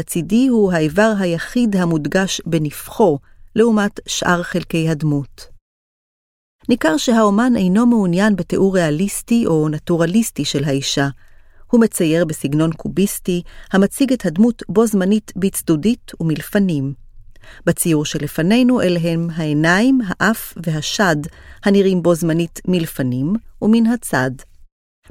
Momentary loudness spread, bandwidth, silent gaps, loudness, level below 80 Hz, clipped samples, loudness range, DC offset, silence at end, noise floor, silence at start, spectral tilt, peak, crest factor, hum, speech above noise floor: 8 LU; 16.5 kHz; 5.61-6.59 s; -17 LUFS; -42 dBFS; under 0.1%; 3 LU; under 0.1%; 0.45 s; under -90 dBFS; 0 s; -5.5 dB/octave; 0 dBFS; 16 dB; none; over 74 dB